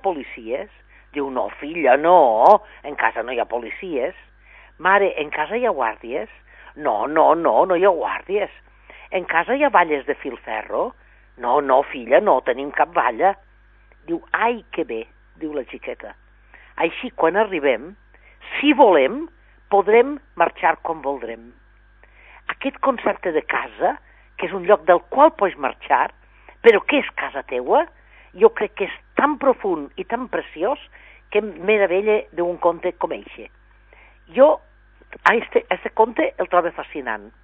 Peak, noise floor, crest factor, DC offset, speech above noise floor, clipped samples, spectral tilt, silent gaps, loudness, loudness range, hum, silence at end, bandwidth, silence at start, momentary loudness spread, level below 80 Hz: 0 dBFS; -52 dBFS; 20 dB; under 0.1%; 32 dB; under 0.1%; -6.5 dB/octave; none; -20 LUFS; 6 LU; 50 Hz at -55 dBFS; 0.15 s; 5.6 kHz; 0.05 s; 14 LU; -52 dBFS